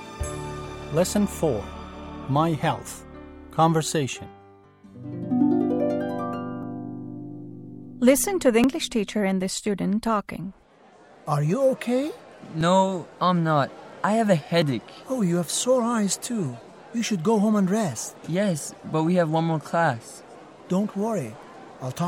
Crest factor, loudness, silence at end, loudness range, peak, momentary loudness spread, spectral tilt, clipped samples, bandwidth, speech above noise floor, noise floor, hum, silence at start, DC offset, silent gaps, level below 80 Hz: 20 dB; -24 LUFS; 0 s; 3 LU; -6 dBFS; 17 LU; -5.5 dB/octave; under 0.1%; 16.5 kHz; 30 dB; -53 dBFS; none; 0 s; under 0.1%; none; -50 dBFS